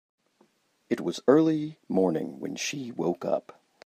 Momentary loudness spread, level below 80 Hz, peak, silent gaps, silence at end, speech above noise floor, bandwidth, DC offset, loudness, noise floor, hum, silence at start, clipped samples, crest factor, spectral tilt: 10 LU; -76 dBFS; -6 dBFS; none; 0.45 s; 40 dB; 14 kHz; under 0.1%; -28 LUFS; -67 dBFS; none; 0.9 s; under 0.1%; 22 dB; -5.5 dB/octave